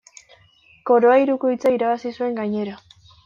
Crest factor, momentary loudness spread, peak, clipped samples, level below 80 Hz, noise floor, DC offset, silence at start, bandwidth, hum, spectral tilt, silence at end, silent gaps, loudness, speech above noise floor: 16 dB; 12 LU; -6 dBFS; under 0.1%; -66 dBFS; -54 dBFS; under 0.1%; 0.85 s; 7.4 kHz; none; -6.5 dB/octave; 0.5 s; none; -19 LUFS; 36 dB